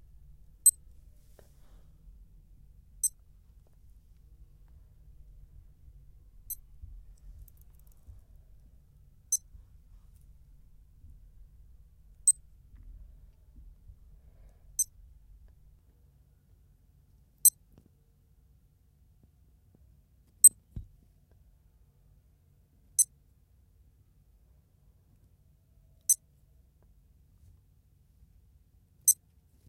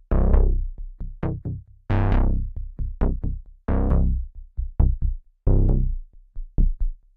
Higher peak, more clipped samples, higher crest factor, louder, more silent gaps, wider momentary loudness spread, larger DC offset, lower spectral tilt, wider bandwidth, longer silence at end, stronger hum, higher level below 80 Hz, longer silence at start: about the same, -6 dBFS vs -6 dBFS; neither; first, 30 dB vs 16 dB; about the same, -26 LUFS vs -26 LUFS; neither; first, 24 LU vs 15 LU; neither; second, 0 dB/octave vs -11.5 dB/octave; first, 16 kHz vs 3.2 kHz; first, 0.55 s vs 0.2 s; neither; second, -58 dBFS vs -22 dBFS; first, 0.65 s vs 0.1 s